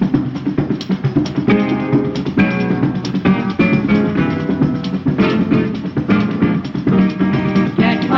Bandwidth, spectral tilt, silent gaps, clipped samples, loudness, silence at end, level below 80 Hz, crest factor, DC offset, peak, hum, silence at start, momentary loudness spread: 6.6 kHz; -8.5 dB/octave; none; under 0.1%; -16 LUFS; 0 s; -42 dBFS; 12 dB; under 0.1%; -2 dBFS; none; 0 s; 4 LU